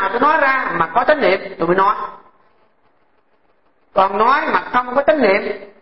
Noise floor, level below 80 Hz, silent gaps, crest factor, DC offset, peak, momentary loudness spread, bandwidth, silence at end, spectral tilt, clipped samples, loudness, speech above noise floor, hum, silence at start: -60 dBFS; -52 dBFS; none; 16 dB; 1%; -2 dBFS; 6 LU; 5.8 kHz; 0.1 s; -9.5 dB/octave; under 0.1%; -16 LUFS; 45 dB; none; 0 s